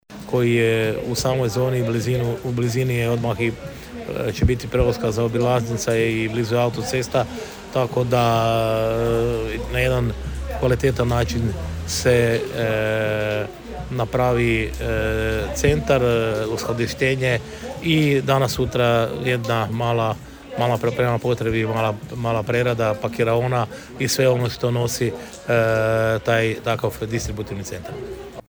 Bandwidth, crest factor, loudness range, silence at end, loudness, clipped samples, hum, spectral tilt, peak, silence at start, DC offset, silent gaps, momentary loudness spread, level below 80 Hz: over 20 kHz; 16 dB; 2 LU; 0.1 s; -21 LUFS; under 0.1%; none; -5.5 dB/octave; -4 dBFS; 0.1 s; under 0.1%; none; 9 LU; -36 dBFS